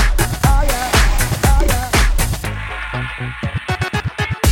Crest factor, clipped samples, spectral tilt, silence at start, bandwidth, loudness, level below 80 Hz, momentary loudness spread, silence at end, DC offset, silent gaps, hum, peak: 14 dB; under 0.1%; -4 dB/octave; 0 s; 17 kHz; -18 LUFS; -18 dBFS; 9 LU; 0 s; under 0.1%; none; none; -2 dBFS